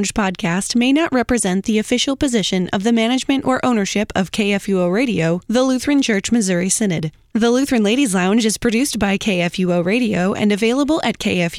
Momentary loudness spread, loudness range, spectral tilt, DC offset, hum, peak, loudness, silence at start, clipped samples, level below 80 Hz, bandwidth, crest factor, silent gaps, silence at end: 3 LU; 1 LU; -4.5 dB/octave; under 0.1%; none; -4 dBFS; -17 LUFS; 0 s; under 0.1%; -44 dBFS; 15.5 kHz; 12 dB; none; 0 s